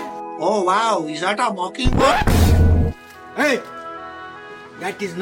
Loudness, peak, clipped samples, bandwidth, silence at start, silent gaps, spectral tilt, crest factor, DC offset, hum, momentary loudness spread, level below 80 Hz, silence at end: -19 LUFS; -2 dBFS; under 0.1%; 17 kHz; 0 s; none; -5.5 dB/octave; 16 dB; under 0.1%; none; 19 LU; -26 dBFS; 0 s